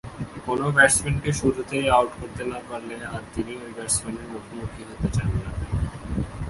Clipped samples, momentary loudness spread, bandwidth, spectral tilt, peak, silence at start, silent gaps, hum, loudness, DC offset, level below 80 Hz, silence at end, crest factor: under 0.1%; 17 LU; 12 kHz; -4.5 dB/octave; -2 dBFS; 0.05 s; none; none; -24 LUFS; under 0.1%; -38 dBFS; 0 s; 22 dB